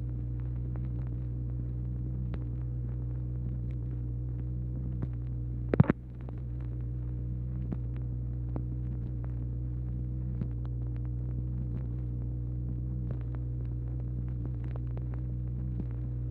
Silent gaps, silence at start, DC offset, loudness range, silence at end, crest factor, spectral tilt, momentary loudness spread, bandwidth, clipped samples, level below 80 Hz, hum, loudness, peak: none; 0 s; under 0.1%; 3 LU; 0 s; 26 dB; -12 dB/octave; 1 LU; 2.9 kHz; under 0.1%; -38 dBFS; none; -36 LUFS; -8 dBFS